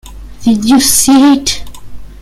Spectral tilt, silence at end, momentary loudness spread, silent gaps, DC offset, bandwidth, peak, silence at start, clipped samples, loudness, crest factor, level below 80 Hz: -2.5 dB/octave; 0.05 s; 10 LU; none; under 0.1%; 16 kHz; 0 dBFS; 0.05 s; under 0.1%; -8 LUFS; 10 dB; -32 dBFS